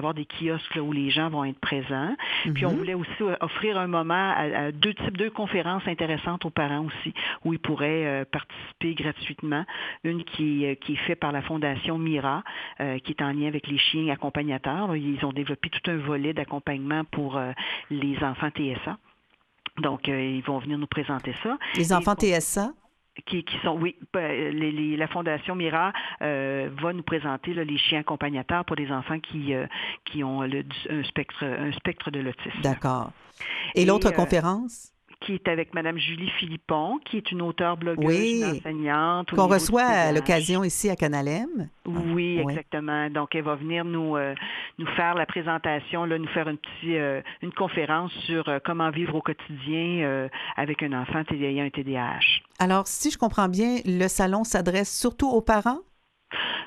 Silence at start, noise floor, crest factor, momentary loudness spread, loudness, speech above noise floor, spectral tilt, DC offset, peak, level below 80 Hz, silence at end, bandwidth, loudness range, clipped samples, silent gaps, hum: 0 s; -66 dBFS; 20 dB; 8 LU; -27 LUFS; 40 dB; -4.5 dB/octave; under 0.1%; -6 dBFS; -50 dBFS; 0 s; 13.5 kHz; 6 LU; under 0.1%; none; none